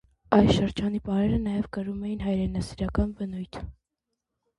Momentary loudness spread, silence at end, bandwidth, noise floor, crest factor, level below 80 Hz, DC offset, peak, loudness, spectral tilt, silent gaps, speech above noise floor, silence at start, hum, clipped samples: 14 LU; 0.85 s; 11.5 kHz; -84 dBFS; 24 dB; -40 dBFS; under 0.1%; -4 dBFS; -27 LUFS; -7.5 dB/octave; none; 58 dB; 0.3 s; none; under 0.1%